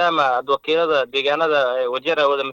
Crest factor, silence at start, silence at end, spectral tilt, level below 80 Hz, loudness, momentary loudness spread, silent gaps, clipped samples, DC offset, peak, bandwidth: 14 dB; 0 s; 0 s; -4 dB/octave; -64 dBFS; -19 LUFS; 3 LU; none; under 0.1%; under 0.1%; -4 dBFS; 17 kHz